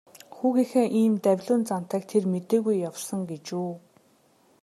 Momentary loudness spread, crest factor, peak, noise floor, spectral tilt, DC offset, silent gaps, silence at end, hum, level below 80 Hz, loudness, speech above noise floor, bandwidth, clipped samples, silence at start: 10 LU; 16 dB; -10 dBFS; -62 dBFS; -6.5 dB/octave; under 0.1%; none; 0.85 s; none; -78 dBFS; -26 LUFS; 37 dB; 14 kHz; under 0.1%; 0.15 s